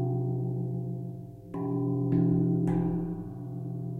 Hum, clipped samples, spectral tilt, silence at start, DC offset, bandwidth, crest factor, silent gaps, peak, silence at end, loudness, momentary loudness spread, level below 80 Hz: none; under 0.1%; -12 dB/octave; 0 s; under 0.1%; 2.7 kHz; 14 dB; none; -14 dBFS; 0 s; -30 LUFS; 13 LU; -52 dBFS